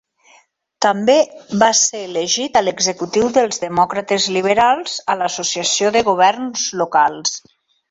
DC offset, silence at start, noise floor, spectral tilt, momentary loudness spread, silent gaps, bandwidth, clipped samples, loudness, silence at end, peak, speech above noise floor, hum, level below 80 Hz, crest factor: under 0.1%; 0.8 s; -53 dBFS; -2 dB/octave; 7 LU; none; 8.2 kHz; under 0.1%; -16 LUFS; 0.5 s; -2 dBFS; 37 dB; none; -58 dBFS; 16 dB